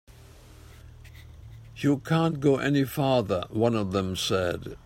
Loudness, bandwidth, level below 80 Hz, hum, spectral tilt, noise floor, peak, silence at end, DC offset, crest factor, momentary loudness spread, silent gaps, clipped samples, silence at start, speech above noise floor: -26 LUFS; 16 kHz; -54 dBFS; none; -6 dB/octave; -50 dBFS; -10 dBFS; 0.1 s; under 0.1%; 18 dB; 7 LU; none; under 0.1%; 0.5 s; 24 dB